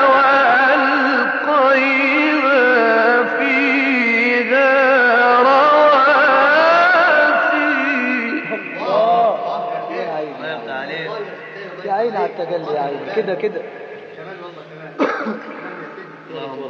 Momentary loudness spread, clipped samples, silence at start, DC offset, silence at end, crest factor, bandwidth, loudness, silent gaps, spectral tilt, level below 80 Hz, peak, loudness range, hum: 20 LU; under 0.1%; 0 s; under 0.1%; 0 s; 12 dB; 7 kHz; -14 LUFS; none; -5 dB/octave; -80 dBFS; -2 dBFS; 12 LU; none